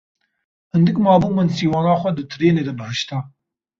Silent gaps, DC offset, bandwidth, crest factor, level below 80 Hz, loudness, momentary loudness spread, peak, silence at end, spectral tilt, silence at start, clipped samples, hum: none; under 0.1%; 7.4 kHz; 16 dB; -52 dBFS; -18 LUFS; 10 LU; -2 dBFS; 0.5 s; -7 dB/octave; 0.75 s; under 0.1%; none